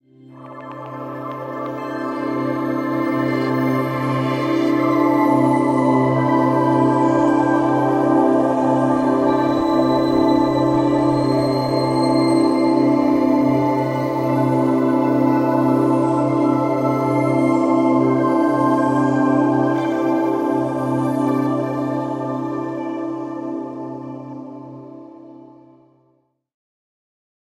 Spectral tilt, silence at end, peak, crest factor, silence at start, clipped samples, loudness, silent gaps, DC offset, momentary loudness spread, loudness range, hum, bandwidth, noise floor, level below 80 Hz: -8 dB/octave; 2.15 s; -4 dBFS; 14 dB; 0.3 s; under 0.1%; -18 LUFS; none; under 0.1%; 12 LU; 9 LU; none; 13.5 kHz; -63 dBFS; -54 dBFS